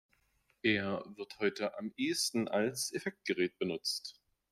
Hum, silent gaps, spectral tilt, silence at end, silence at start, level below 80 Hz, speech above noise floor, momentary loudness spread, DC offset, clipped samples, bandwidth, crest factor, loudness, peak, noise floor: none; none; -3.5 dB/octave; 0.4 s; 0.65 s; -76 dBFS; 40 dB; 7 LU; under 0.1%; under 0.1%; 15.5 kHz; 20 dB; -35 LUFS; -16 dBFS; -75 dBFS